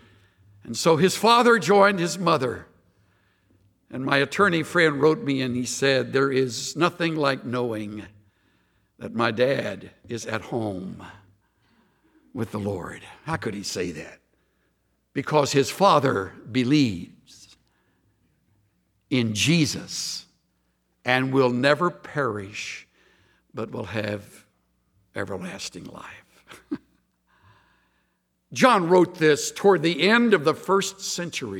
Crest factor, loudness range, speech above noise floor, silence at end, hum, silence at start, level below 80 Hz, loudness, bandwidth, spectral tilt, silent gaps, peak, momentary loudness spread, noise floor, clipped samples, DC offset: 22 dB; 13 LU; 49 dB; 0 s; none; 0.65 s; -64 dBFS; -23 LUFS; 17.5 kHz; -4.5 dB/octave; none; -2 dBFS; 18 LU; -72 dBFS; under 0.1%; under 0.1%